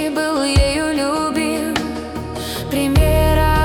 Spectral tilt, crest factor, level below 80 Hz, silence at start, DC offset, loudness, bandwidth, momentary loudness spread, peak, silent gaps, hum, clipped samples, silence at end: -5.5 dB/octave; 14 dB; -24 dBFS; 0 s; under 0.1%; -18 LUFS; 18 kHz; 10 LU; -4 dBFS; none; none; under 0.1%; 0 s